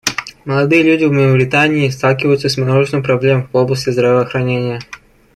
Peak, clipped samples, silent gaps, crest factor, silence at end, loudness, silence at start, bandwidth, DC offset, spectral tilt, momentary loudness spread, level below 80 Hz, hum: -2 dBFS; under 0.1%; none; 12 dB; 0.4 s; -13 LUFS; 0.05 s; 15 kHz; under 0.1%; -6 dB/octave; 8 LU; -48 dBFS; none